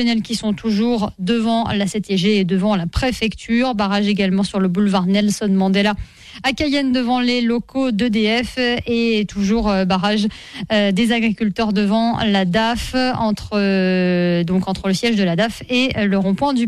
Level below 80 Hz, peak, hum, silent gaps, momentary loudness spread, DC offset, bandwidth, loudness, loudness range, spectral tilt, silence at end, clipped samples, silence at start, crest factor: -38 dBFS; -4 dBFS; none; none; 4 LU; 0.2%; 13 kHz; -18 LUFS; 1 LU; -5.5 dB/octave; 0 s; under 0.1%; 0 s; 14 dB